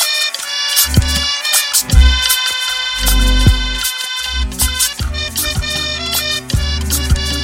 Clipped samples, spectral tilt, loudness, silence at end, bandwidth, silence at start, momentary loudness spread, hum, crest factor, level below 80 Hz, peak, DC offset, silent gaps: under 0.1%; -2 dB/octave; -14 LUFS; 0 s; 17 kHz; 0 s; 6 LU; none; 14 dB; -18 dBFS; 0 dBFS; under 0.1%; none